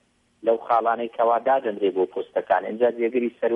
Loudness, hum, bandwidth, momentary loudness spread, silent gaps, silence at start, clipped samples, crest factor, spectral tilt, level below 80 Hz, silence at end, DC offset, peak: -23 LUFS; none; 4.8 kHz; 4 LU; none; 0.45 s; under 0.1%; 16 dB; -7.5 dB/octave; -74 dBFS; 0 s; under 0.1%; -8 dBFS